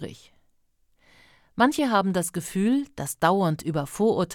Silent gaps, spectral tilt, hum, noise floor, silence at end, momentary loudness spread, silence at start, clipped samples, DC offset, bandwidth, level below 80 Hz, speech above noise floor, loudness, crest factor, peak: none; -5.5 dB/octave; none; -65 dBFS; 0 s; 8 LU; 0 s; under 0.1%; under 0.1%; 18.5 kHz; -60 dBFS; 41 dB; -24 LUFS; 18 dB; -8 dBFS